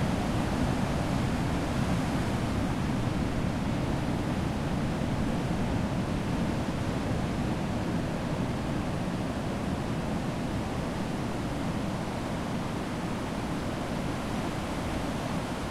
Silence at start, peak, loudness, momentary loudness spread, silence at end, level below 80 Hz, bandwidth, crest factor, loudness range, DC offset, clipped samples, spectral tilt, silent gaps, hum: 0 s; -16 dBFS; -31 LUFS; 4 LU; 0 s; -40 dBFS; 15.5 kHz; 14 dB; 3 LU; under 0.1%; under 0.1%; -6.5 dB/octave; none; none